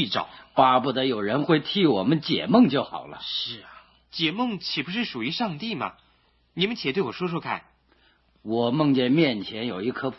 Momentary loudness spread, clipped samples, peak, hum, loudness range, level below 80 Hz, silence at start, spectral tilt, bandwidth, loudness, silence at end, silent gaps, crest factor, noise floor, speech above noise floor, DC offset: 13 LU; under 0.1%; -4 dBFS; none; 7 LU; -64 dBFS; 0 s; -7.5 dB/octave; 6 kHz; -24 LUFS; 0 s; none; 20 dB; -64 dBFS; 39 dB; under 0.1%